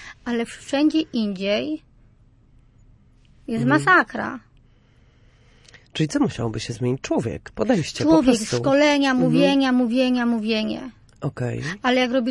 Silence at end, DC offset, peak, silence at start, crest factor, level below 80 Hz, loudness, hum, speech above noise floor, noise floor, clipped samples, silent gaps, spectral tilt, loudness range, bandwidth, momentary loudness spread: 0 s; under 0.1%; -4 dBFS; 0 s; 18 dB; -52 dBFS; -21 LUFS; none; 34 dB; -55 dBFS; under 0.1%; none; -5.5 dB/octave; 7 LU; 11.5 kHz; 13 LU